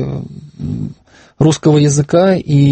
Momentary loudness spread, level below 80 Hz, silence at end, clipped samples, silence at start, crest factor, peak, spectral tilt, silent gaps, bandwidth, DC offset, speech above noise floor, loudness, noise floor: 16 LU; -42 dBFS; 0 s; under 0.1%; 0 s; 14 dB; 0 dBFS; -6.5 dB/octave; none; 8.8 kHz; under 0.1%; 24 dB; -13 LUFS; -35 dBFS